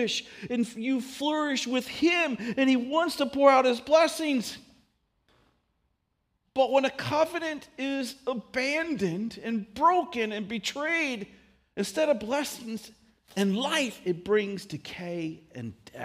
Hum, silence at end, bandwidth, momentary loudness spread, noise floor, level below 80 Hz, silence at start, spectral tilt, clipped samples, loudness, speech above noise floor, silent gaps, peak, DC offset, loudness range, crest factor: none; 0 s; 15.5 kHz; 15 LU; -77 dBFS; -66 dBFS; 0 s; -4 dB/octave; under 0.1%; -27 LUFS; 49 dB; none; -6 dBFS; under 0.1%; 6 LU; 22 dB